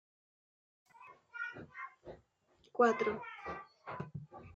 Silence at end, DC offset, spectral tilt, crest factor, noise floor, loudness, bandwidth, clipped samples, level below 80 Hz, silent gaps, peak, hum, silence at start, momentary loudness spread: 0.05 s; under 0.1%; -6 dB/octave; 24 dB; -71 dBFS; -38 LUFS; 7.6 kHz; under 0.1%; -74 dBFS; none; -18 dBFS; none; 1 s; 27 LU